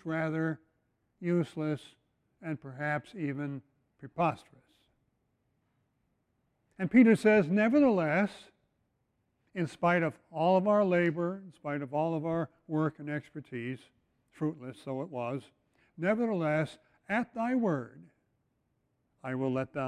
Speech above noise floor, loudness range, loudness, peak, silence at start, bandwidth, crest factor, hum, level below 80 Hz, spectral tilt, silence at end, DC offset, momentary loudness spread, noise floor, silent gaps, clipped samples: 47 dB; 10 LU; -31 LUFS; -12 dBFS; 0.05 s; 11 kHz; 20 dB; none; -72 dBFS; -8 dB/octave; 0 s; under 0.1%; 16 LU; -78 dBFS; none; under 0.1%